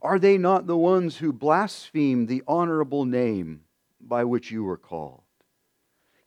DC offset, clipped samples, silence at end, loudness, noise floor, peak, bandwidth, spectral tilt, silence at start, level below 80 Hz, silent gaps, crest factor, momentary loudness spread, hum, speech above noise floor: under 0.1%; under 0.1%; 1.15 s; -24 LUFS; -73 dBFS; -6 dBFS; 11 kHz; -7.5 dB/octave; 0.05 s; -68 dBFS; none; 18 dB; 13 LU; none; 50 dB